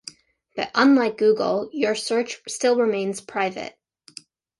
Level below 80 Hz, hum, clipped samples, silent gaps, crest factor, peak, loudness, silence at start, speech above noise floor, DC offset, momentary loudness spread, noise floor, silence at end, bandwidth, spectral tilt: -70 dBFS; none; under 0.1%; none; 20 dB; -2 dBFS; -22 LUFS; 0.05 s; 26 dB; under 0.1%; 21 LU; -47 dBFS; 0.9 s; 11.5 kHz; -4 dB/octave